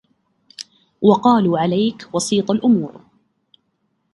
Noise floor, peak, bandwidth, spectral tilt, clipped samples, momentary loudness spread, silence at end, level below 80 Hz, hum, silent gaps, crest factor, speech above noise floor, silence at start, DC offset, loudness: -69 dBFS; 0 dBFS; 11.5 kHz; -6 dB/octave; under 0.1%; 22 LU; 1.15 s; -60 dBFS; none; none; 18 dB; 52 dB; 0.6 s; under 0.1%; -17 LUFS